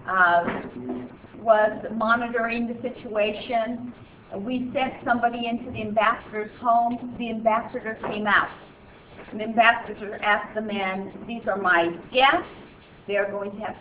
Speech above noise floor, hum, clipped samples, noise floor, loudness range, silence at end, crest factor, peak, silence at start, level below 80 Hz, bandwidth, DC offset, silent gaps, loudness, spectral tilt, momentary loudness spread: 22 dB; none; under 0.1%; -47 dBFS; 3 LU; 0 s; 22 dB; -4 dBFS; 0 s; -56 dBFS; 4 kHz; under 0.1%; none; -24 LUFS; -8 dB/octave; 15 LU